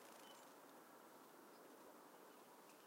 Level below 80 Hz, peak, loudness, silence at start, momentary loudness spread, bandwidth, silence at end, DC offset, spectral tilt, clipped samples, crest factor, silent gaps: under -90 dBFS; -48 dBFS; -63 LUFS; 0 s; 3 LU; 16 kHz; 0 s; under 0.1%; -2.5 dB/octave; under 0.1%; 16 dB; none